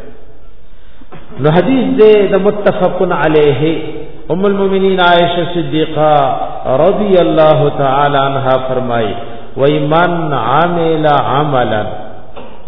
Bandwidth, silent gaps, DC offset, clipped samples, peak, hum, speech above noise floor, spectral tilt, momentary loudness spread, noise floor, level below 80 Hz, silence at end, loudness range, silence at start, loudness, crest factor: 5.4 kHz; none; 10%; 0.3%; 0 dBFS; none; 26 dB; -9.5 dB/octave; 11 LU; -37 dBFS; -36 dBFS; 0.05 s; 2 LU; 0 s; -11 LUFS; 12 dB